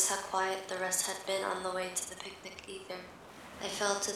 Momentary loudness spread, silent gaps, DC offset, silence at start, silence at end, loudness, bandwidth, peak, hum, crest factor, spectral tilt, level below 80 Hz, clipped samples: 14 LU; none; under 0.1%; 0 s; 0 s; -35 LUFS; 18.5 kHz; -14 dBFS; none; 22 dB; -1 dB/octave; -70 dBFS; under 0.1%